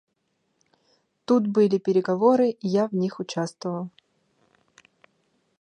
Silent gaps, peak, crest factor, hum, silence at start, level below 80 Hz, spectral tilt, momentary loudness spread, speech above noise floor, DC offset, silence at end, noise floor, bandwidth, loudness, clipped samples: none; -6 dBFS; 20 dB; none; 1.3 s; -76 dBFS; -7 dB/octave; 12 LU; 51 dB; under 0.1%; 1.75 s; -74 dBFS; 10 kHz; -23 LUFS; under 0.1%